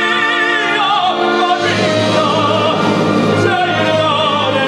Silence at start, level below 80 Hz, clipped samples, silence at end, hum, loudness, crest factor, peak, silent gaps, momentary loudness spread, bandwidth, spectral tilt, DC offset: 0 s; -54 dBFS; under 0.1%; 0 s; none; -13 LUFS; 12 dB; -2 dBFS; none; 1 LU; 13 kHz; -5 dB/octave; under 0.1%